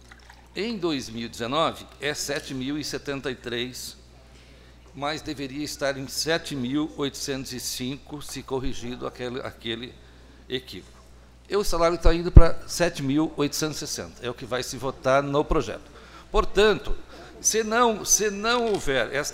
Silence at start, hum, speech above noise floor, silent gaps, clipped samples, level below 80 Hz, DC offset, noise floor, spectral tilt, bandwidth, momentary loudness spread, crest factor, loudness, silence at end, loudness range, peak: 0.55 s; none; 26 dB; none; under 0.1%; -30 dBFS; under 0.1%; -49 dBFS; -4 dB/octave; 16 kHz; 14 LU; 24 dB; -26 LUFS; 0 s; 9 LU; 0 dBFS